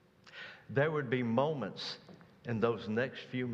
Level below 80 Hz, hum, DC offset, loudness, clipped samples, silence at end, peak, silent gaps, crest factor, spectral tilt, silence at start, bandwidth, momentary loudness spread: -74 dBFS; none; under 0.1%; -35 LUFS; under 0.1%; 0 s; -16 dBFS; none; 20 dB; -7 dB/octave; 0.25 s; 8 kHz; 16 LU